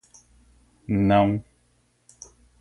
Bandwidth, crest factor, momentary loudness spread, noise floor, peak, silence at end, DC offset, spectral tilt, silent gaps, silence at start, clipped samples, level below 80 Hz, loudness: 11 kHz; 20 dB; 27 LU; -65 dBFS; -6 dBFS; 1.2 s; under 0.1%; -7.5 dB/octave; none; 0.9 s; under 0.1%; -48 dBFS; -22 LUFS